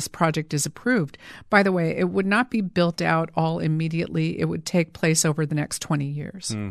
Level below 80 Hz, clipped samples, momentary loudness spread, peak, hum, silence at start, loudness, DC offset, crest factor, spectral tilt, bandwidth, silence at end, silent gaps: -56 dBFS; under 0.1%; 7 LU; -4 dBFS; none; 0 s; -23 LUFS; under 0.1%; 20 dB; -5 dB/octave; 14 kHz; 0 s; none